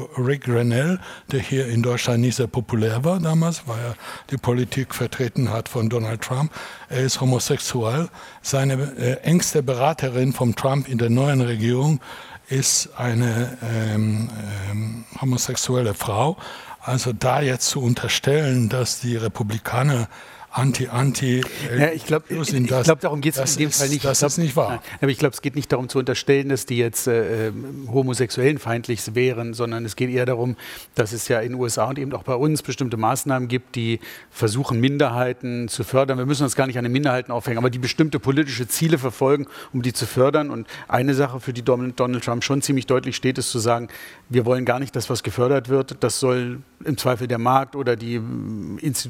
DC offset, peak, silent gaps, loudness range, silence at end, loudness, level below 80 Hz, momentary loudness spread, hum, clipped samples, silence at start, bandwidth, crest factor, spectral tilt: under 0.1%; -2 dBFS; none; 3 LU; 0 s; -22 LUFS; -56 dBFS; 8 LU; none; under 0.1%; 0 s; 17 kHz; 20 dB; -5 dB/octave